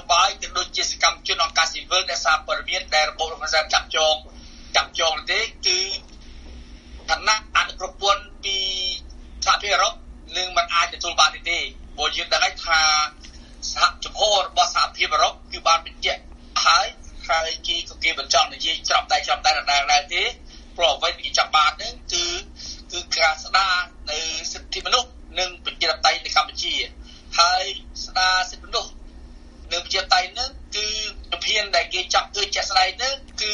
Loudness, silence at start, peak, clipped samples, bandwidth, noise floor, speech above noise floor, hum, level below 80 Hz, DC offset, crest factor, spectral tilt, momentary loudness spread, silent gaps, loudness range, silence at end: -21 LUFS; 0 s; -2 dBFS; under 0.1%; 11 kHz; -42 dBFS; 21 dB; none; -42 dBFS; under 0.1%; 22 dB; 0 dB/octave; 9 LU; none; 3 LU; 0 s